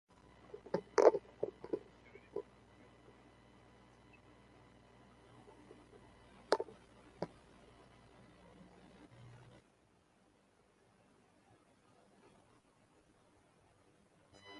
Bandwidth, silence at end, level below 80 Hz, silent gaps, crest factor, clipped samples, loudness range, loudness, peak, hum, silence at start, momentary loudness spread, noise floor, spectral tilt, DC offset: 11.5 kHz; 0 s; -74 dBFS; none; 34 dB; under 0.1%; 25 LU; -38 LUFS; -10 dBFS; none; 0.55 s; 25 LU; -72 dBFS; -5 dB/octave; under 0.1%